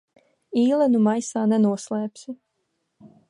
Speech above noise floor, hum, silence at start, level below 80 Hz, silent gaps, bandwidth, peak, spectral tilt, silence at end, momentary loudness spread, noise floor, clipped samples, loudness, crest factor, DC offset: 54 dB; none; 0.5 s; -76 dBFS; none; 11 kHz; -8 dBFS; -6.5 dB/octave; 0.25 s; 20 LU; -75 dBFS; under 0.1%; -22 LUFS; 16 dB; under 0.1%